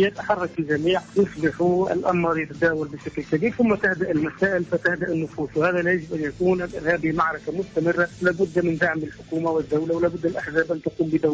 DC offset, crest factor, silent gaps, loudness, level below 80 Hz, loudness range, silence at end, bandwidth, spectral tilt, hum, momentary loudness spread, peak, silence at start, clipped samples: under 0.1%; 14 dB; none; -23 LUFS; -52 dBFS; 1 LU; 0 s; 8 kHz; -7 dB/octave; none; 6 LU; -10 dBFS; 0 s; under 0.1%